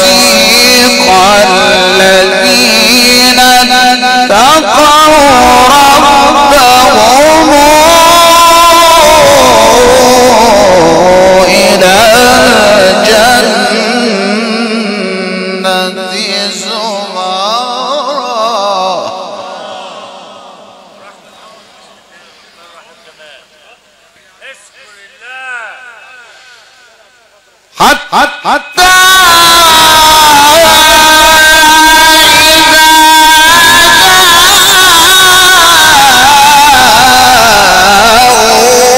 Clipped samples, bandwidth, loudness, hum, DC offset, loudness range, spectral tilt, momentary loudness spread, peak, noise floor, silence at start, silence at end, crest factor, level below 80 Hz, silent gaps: 1%; over 20 kHz; -3 LUFS; none; under 0.1%; 12 LU; -1.5 dB/octave; 11 LU; 0 dBFS; -44 dBFS; 0 s; 0 s; 6 dB; -30 dBFS; none